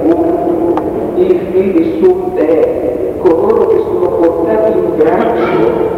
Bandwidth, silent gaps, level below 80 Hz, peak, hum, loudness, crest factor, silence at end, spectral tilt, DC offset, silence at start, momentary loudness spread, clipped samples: 5.8 kHz; none; -38 dBFS; 0 dBFS; none; -11 LUFS; 10 dB; 0 s; -8.5 dB/octave; under 0.1%; 0 s; 3 LU; under 0.1%